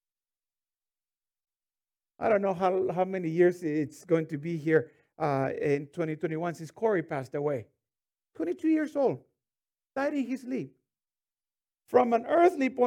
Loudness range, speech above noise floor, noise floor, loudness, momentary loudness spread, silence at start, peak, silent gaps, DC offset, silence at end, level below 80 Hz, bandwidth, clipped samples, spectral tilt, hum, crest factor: 4 LU; over 62 dB; under -90 dBFS; -29 LUFS; 10 LU; 2.2 s; -8 dBFS; none; under 0.1%; 0 s; -76 dBFS; 12.5 kHz; under 0.1%; -7.5 dB/octave; none; 20 dB